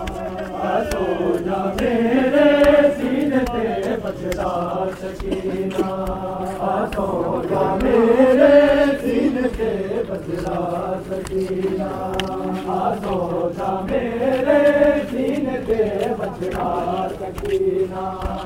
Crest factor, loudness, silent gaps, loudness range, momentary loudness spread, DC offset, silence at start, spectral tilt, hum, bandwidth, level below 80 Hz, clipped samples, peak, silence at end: 18 dB; -20 LUFS; none; 7 LU; 12 LU; under 0.1%; 0 s; -6.5 dB/octave; none; 16 kHz; -38 dBFS; under 0.1%; 0 dBFS; 0 s